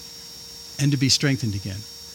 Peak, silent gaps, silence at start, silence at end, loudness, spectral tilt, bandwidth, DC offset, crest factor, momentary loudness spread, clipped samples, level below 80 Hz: -6 dBFS; none; 0 s; 0 s; -22 LUFS; -4 dB/octave; 17 kHz; under 0.1%; 18 dB; 18 LU; under 0.1%; -56 dBFS